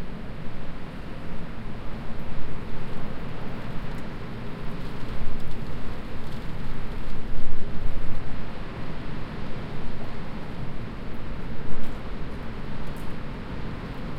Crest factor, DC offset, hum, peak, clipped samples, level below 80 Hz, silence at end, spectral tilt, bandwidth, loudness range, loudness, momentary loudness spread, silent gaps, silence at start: 14 dB; under 0.1%; none; -6 dBFS; under 0.1%; -34 dBFS; 0 s; -7 dB/octave; 5.2 kHz; 1 LU; -37 LUFS; 2 LU; none; 0 s